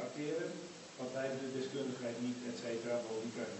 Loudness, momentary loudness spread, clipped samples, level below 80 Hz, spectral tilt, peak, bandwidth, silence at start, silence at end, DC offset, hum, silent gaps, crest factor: -41 LUFS; 5 LU; under 0.1%; -84 dBFS; -4.5 dB/octave; -26 dBFS; 8.2 kHz; 0 s; 0 s; under 0.1%; none; none; 14 dB